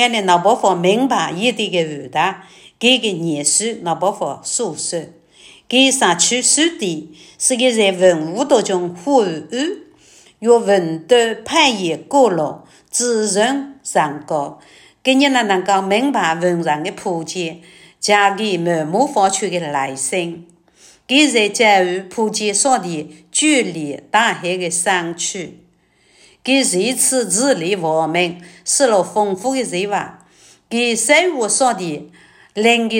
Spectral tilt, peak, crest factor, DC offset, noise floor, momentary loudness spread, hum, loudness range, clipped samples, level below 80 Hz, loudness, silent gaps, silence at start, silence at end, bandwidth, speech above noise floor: -2.5 dB/octave; 0 dBFS; 16 dB; under 0.1%; -56 dBFS; 11 LU; none; 3 LU; under 0.1%; -66 dBFS; -16 LUFS; none; 0 s; 0 s; 16.5 kHz; 39 dB